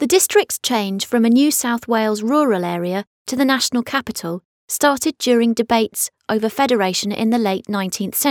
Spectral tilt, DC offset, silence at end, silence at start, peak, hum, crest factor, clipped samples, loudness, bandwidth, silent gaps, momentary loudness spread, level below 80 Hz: -3.5 dB/octave; under 0.1%; 0 s; 0 s; -2 dBFS; none; 16 dB; under 0.1%; -18 LUFS; 19.5 kHz; 3.07-3.25 s, 4.45-4.68 s; 8 LU; -60 dBFS